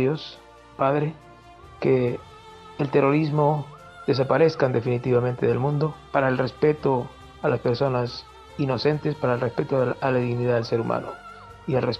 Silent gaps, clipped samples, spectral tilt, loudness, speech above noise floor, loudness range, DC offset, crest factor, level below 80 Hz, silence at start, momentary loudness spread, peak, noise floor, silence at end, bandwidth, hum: none; under 0.1%; -8 dB/octave; -24 LUFS; 24 dB; 3 LU; under 0.1%; 18 dB; -54 dBFS; 0 s; 13 LU; -6 dBFS; -46 dBFS; 0 s; 8.6 kHz; none